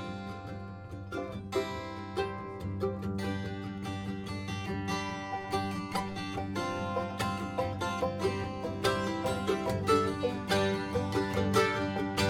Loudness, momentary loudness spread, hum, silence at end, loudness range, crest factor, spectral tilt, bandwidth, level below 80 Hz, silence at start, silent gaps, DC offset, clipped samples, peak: -33 LUFS; 11 LU; none; 0 s; 6 LU; 20 dB; -5.5 dB/octave; 17.5 kHz; -54 dBFS; 0 s; none; under 0.1%; under 0.1%; -14 dBFS